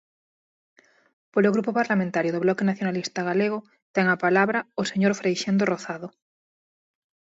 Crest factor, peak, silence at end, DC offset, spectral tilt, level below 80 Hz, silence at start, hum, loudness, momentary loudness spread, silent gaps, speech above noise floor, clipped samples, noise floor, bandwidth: 18 dB; -8 dBFS; 1.2 s; under 0.1%; -6 dB/octave; -72 dBFS; 1.35 s; none; -24 LUFS; 8 LU; 3.82-3.94 s; over 67 dB; under 0.1%; under -90 dBFS; 8 kHz